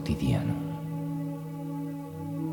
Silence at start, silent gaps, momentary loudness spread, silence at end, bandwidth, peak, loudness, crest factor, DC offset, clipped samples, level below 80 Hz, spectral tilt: 0 s; none; 9 LU; 0 s; 19 kHz; -16 dBFS; -33 LUFS; 16 dB; under 0.1%; under 0.1%; -48 dBFS; -8 dB/octave